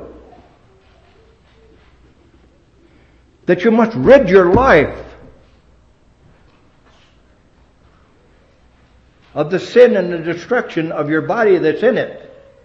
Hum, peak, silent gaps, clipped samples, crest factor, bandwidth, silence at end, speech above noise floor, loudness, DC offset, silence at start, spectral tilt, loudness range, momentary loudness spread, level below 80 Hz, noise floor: none; 0 dBFS; none; 0.1%; 16 dB; 7.6 kHz; 0.45 s; 38 dB; -13 LUFS; under 0.1%; 0 s; -7 dB/octave; 10 LU; 13 LU; -42 dBFS; -51 dBFS